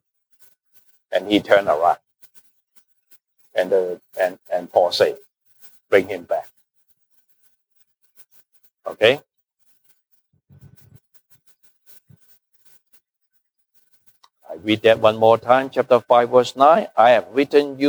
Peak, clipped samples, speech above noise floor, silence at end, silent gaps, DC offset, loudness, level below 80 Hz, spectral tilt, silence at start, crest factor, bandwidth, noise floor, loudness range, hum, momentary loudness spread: -2 dBFS; under 0.1%; 53 dB; 0 s; none; under 0.1%; -18 LUFS; -68 dBFS; -5 dB/octave; 1.1 s; 20 dB; over 20 kHz; -70 dBFS; 11 LU; none; 13 LU